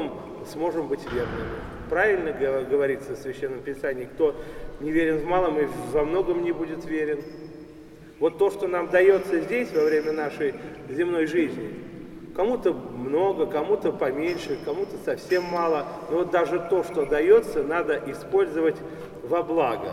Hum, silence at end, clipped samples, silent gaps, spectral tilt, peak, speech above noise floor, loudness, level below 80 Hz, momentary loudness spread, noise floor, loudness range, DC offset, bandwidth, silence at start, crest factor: none; 0 s; under 0.1%; none; -6.5 dB/octave; -6 dBFS; 21 dB; -25 LUFS; -48 dBFS; 12 LU; -45 dBFS; 3 LU; under 0.1%; 14.5 kHz; 0 s; 18 dB